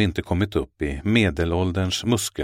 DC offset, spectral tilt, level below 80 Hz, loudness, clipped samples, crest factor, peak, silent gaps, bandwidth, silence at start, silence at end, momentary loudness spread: under 0.1%; -5 dB/octave; -38 dBFS; -23 LUFS; under 0.1%; 18 dB; -4 dBFS; none; 16.5 kHz; 0 s; 0 s; 6 LU